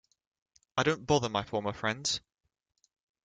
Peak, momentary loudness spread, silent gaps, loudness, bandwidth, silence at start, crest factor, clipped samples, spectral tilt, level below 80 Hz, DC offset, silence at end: -10 dBFS; 7 LU; none; -31 LUFS; 9.6 kHz; 0.75 s; 24 dB; under 0.1%; -4 dB/octave; -62 dBFS; under 0.1%; 1.05 s